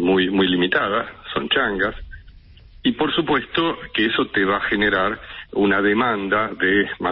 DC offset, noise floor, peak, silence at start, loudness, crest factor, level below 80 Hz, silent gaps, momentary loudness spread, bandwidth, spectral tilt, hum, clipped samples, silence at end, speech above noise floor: under 0.1%; -45 dBFS; -6 dBFS; 0 s; -20 LUFS; 14 dB; -46 dBFS; none; 7 LU; 5.6 kHz; -10 dB/octave; none; under 0.1%; 0 s; 25 dB